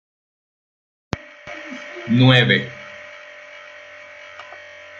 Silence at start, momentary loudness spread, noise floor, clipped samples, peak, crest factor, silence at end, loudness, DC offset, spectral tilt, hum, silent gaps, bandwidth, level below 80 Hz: 1.15 s; 25 LU; -40 dBFS; under 0.1%; -2 dBFS; 22 dB; 0.45 s; -16 LUFS; under 0.1%; -6.5 dB/octave; none; none; 7.4 kHz; -56 dBFS